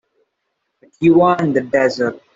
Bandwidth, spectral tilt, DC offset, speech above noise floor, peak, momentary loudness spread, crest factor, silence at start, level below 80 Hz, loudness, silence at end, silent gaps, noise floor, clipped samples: 7.6 kHz; -7 dB/octave; under 0.1%; 58 dB; -2 dBFS; 5 LU; 14 dB; 1 s; -56 dBFS; -15 LUFS; 0.15 s; none; -73 dBFS; under 0.1%